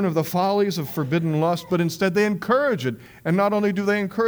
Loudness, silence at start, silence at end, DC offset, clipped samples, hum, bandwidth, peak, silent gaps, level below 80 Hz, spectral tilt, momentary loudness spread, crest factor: -22 LUFS; 0 s; 0 s; under 0.1%; under 0.1%; none; over 20 kHz; -6 dBFS; none; -60 dBFS; -6.5 dB/octave; 5 LU; 14 dB